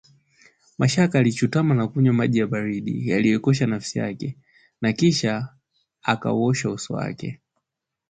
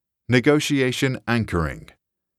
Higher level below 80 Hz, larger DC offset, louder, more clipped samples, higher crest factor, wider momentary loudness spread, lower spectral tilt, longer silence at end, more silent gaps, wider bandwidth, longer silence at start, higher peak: second, -58 dBFS vs -42 dBFS; neither; about the same, -22 LUFS vs -21 LUFS; neither; about the same, 18 dB vs 20 dB; about the same, 11 LU vs 9 LU; about the same, -6 dB/octave vs -5.5 dB/octave; first, 0.75 s vs 0.6 s; neither; second, 9.4 kHz vs 14.5 kHz; first, 0.8 s vs 0.3 s; about the same, -6 dBFS vs -4 dBFS